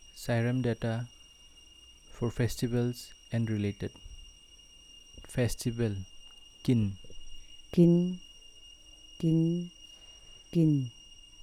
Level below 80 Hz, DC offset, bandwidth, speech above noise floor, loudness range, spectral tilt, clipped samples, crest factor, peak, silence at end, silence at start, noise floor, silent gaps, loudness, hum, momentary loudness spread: -52 dBFS; under 0.1%; 14.5 kHz; 27 dB; 5 LU; -7 dB/octave; under 0.1%; 20 dB; -12 dBFS; 0 s; 0.05 s; -56 dBFS; none; -31 LUFS; none; 24 LU